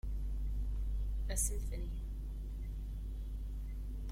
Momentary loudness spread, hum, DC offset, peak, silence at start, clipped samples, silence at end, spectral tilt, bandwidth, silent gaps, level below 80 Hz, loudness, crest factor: 9 LU; none; under 0.1%; -22 dBFS; 0.05 s; under 0.1%; 0 s; -4.5 dB/octave; 16 kHz; none; -38 dBFS; -42 LUFS; 16 dB